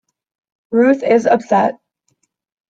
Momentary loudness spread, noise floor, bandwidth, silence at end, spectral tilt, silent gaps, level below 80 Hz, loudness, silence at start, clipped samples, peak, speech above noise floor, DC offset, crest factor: 6 LU; -66 dBFS; 7.8 kHz; 0.95 s; -6.5 dB/octave; none; -64 dBFS; -14 LUFS; 0.7 s; under 0.1%; -2 dBFS; 53 dB; under 0.1%; 16 dB